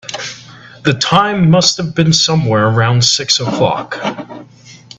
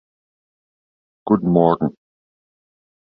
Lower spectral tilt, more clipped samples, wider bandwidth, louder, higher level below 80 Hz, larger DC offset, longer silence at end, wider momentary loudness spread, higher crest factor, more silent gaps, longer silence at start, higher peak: second, -4 dB/octave vs -12.5 dB/octave; neither; first, 8.4 kHz vs 4.8 kHz; first, -12 LUFS vs -18 LUFS; first, -48 dBFS vs -54 dBFS; neither; second, 0.25 s vs 1.15 s; first, 14 LU vs 11 LU; second, 14 dB vs 20 dB; neither; second, 0.05 s vs 1.25 s; about the same, 0 dBFS vs -2 dBFS